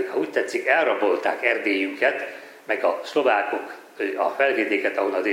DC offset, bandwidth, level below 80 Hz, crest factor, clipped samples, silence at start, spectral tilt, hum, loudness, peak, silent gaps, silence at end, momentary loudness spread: under 0.1%; 16 kHz; -86 dBFS; 18 dB; under 0.1%; 0 s; -3.5 dB/octave; none; -23 LUFS; -4 dBFS; none; 0 s; 10 LU